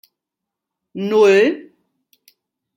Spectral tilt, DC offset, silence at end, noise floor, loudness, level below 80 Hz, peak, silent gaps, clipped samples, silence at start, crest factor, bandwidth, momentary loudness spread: -5.5 dB/octave; under 0.1%; 1.15 s; -83 dBFS; -15 LUFS; -72 dBFS; -2 dBFS; none; under 0.1%; 0.95 s; 18 dB; 16 kHz; 20 LU